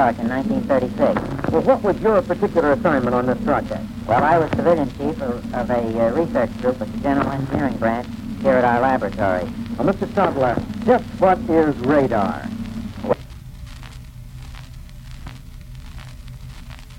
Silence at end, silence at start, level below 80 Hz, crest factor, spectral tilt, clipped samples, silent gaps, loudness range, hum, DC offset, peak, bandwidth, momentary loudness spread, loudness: 0 s; 0 s; -38 dBFS; 18 dB; -7.5 dB/octave; under 0.1%; none; 12 LU; none; under 0.1%; -2 dBFS; 16.5 kHz; 21 LU; -20 LUFS